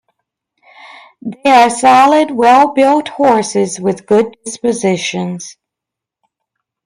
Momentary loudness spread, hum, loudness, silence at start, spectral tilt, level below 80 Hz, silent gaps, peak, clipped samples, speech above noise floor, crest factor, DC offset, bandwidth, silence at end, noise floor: 14 LU; none; -11 LUFS; 0.85 s; -4.5 dB/octave; -60 dBFS; none; 0 dBFS; under 0.1%; 71 dB; 14 dB; under 0.1%; 14.5 kHz; 1.35 s; -83 dBFS